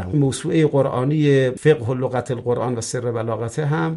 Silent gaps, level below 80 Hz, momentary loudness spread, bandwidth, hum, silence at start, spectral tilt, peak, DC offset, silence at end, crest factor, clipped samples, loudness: none; -54 dBFS; 7 LU; 11.5 kHz; none; 0 s; -6.5 dB/octave; -2 dBFS; under 0.1%; 0 s; 16 dB; under 0.1%; -20 LUFS